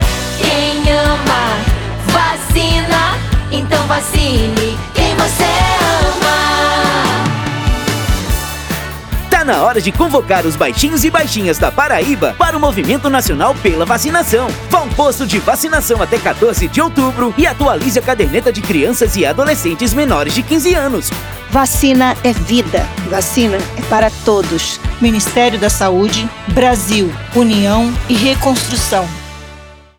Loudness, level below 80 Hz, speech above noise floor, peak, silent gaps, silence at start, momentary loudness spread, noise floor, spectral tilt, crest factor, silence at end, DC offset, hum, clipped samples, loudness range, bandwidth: -13 LUFS; -24 dBFS; 23 dB; 0 dBFS; none; 0 s; 5 LU; -35 dBFS; -4 dB/octave; 12 dB; 0.25 s; under 0.1%; none; under 0.1%; 1 LU; over 20 kHz